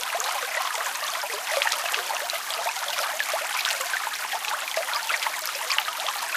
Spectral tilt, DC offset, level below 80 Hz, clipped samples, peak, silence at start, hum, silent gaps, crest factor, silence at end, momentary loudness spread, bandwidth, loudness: 3.5 dB/octave; under 0.1%; -86 dBFS; under 0.1%; -4 dBFS; 0 s; none; none; 24 dB; 0 s; 3 LU; 16 kHz; -26 LUFS